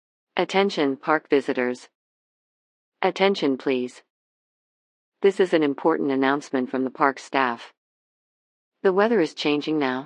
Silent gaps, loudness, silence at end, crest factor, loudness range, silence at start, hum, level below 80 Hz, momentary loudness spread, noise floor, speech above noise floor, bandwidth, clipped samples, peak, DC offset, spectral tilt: 1.95-2.92 s, 4.10-5.12 s, 7.77-8.72 s; -23 LUFS; 0 s; 20 dB; 4 LU; 0.35 s; none; under -90 dBFS; 6 LU; under -90 dBFS; over 68 dB; 9.8 kHz; under 0.1%; -4 dBFS; under 0.1%; -5.5 dB/octave